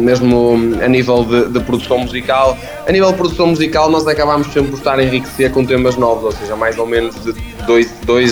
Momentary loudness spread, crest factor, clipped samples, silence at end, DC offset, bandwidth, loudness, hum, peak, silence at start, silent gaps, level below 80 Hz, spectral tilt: 6 LU; 12 dB; under 0.1%; 0 s; under 0.1%; over 20 kHz; -13 LUFS; none; 0 dBFS; 0 s; none; -32 dBFS; -6 dB/octave